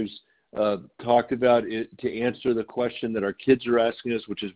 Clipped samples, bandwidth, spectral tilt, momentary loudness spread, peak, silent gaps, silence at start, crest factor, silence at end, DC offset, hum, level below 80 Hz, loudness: under 0.1%; 4 kHz; -10 dB/octave; 10 LU; -6 dBFS; none; 0 s; 20 dB; 0.05 s; under 0.1%; none; -60 dBFS; -25 LUFS